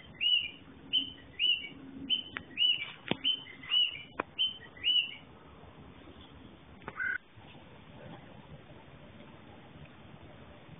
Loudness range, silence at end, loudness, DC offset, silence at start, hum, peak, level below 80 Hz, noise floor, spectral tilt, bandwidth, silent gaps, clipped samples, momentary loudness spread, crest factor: 13 LU; 0 s; -31 LUFS; under 0.1%; 0 s; none; -12 dBFS; -64 dBFS; -54 dBFS; 1 dB/octave; 3.9 kHz; none; under 0.1%; 25 LU; 24 dB